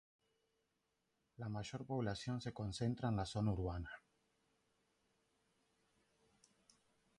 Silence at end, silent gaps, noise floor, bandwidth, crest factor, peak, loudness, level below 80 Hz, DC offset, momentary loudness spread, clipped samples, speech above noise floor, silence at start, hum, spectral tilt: 3.2 s; none; -86 dBFS; 11 kHz; 18 dB; -28 dBFS; -43 LUFS; -60 dBFS; under 0.1%; 10 LU; under 0.1%; 44 dB; 1.4 s; none; -6.5 dB/octave